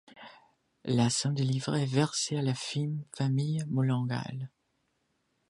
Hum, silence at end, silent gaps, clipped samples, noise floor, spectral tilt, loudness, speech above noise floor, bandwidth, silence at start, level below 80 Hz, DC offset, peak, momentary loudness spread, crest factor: none; 1.05 s; none; under 0.1%; -77 dBFS; -5.5 dB/octave; -30 LUFS; 47 dB; 11.5 kHz; 0.15 s; -70 dBFS; under 0.1%; -12 dBFS; 14 LU; 18 dB